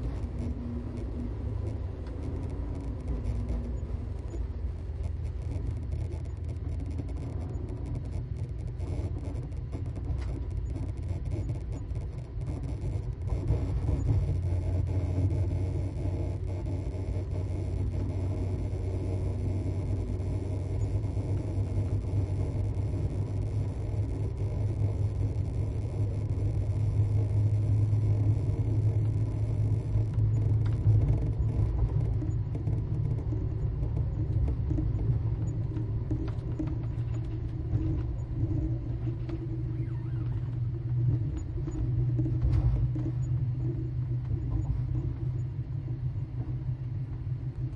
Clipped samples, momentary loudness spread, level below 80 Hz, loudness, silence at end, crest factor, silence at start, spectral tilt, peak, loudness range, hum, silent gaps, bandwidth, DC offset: under 0.1%; 8 LU; -36 dBFS; -32 LUFS; 0 s; 16 dB; 0 s; -9.5 dB/octave; -14 dBFS; 8 LU; none; none; 10 kHz; under 0.1%